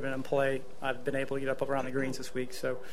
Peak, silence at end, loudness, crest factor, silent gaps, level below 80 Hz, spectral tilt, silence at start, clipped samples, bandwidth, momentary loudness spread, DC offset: -14 dBFS; 0 s; -33 LUFS; 18 dB; none; -60 dBFS; -5.5 dB/octave; 0 s; under 0.1%; 15 kHz; 6 LU; 2%